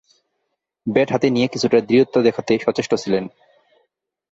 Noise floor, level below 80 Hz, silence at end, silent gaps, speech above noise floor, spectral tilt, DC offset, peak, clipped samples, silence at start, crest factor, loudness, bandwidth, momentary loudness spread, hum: -75 dBFS; -58 dBFS; 1.05 s; none; 58 dB; -5.5 dB/octave; under 0.1%; -2 dBFS; under 0.1%; 0.85 s; 18 dB; -18 LUFS; 8 kHz; 8 LU; none